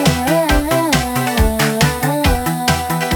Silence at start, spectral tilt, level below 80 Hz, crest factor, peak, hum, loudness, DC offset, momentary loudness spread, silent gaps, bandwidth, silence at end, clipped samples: 0 s; -4.5 dB/octave; -24 dBFS; 16 dB; 0 dBFS; none; -15 LUFS; under 0.1%; 3 LU; none; over 20 kHz; 0 s; under 0.1%